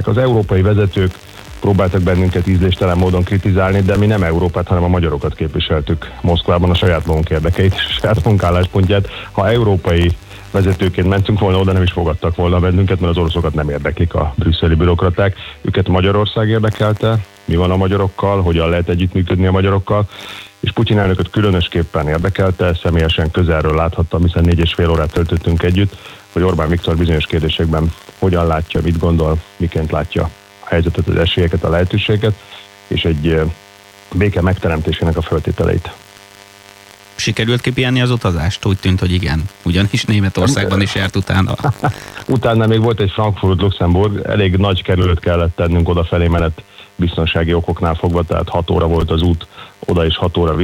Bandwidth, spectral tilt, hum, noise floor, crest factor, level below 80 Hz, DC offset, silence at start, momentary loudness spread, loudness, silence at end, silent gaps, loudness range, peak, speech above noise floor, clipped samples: 12 kHz; -7 dB/octave; none; -41 dBFS; 12 dB; -26 dBFS; under 0.1%; 0 s; 6 LU; -15 LUFS; 0 s; none; 3 LU; -2 dBFS; 27 dB; under 0.1%